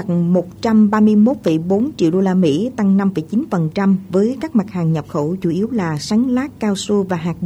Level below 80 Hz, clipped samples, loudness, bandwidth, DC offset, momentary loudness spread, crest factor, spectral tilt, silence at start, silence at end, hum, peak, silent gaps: -50 dBFS; under 0.1%; -17 LUFS; 10 kHz; under 0.1%; 7 LU; 12 dB; -7.5 dB/octave; 0 s; 0 s; none; -4 dBFS; none